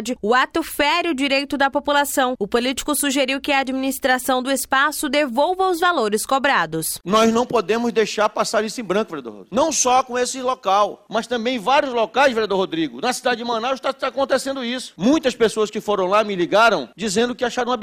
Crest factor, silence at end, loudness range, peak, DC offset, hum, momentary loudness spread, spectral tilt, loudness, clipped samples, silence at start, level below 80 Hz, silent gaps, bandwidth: 14 dB; 0 s; 2 LU; -6 dBFS; under 0.1%; none; 6 LU; -3 dB/octave; -19 LUFS; under 0.1%; 0 s; -52 dBFS; none; 17.5 kHz